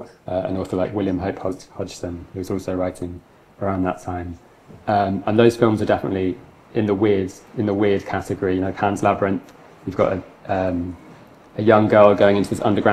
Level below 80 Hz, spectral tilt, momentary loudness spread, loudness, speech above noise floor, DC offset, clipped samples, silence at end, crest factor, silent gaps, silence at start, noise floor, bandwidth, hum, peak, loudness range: -54 dBFS; -7 dB/octave; 16 LU; -20 LUFS; 25 dB; under 0.1%; under 0.1%; 0 s; 20 dB; none; 0 s; -45 dBFS; 14 kHz; none; 0 dBFS; 8 LU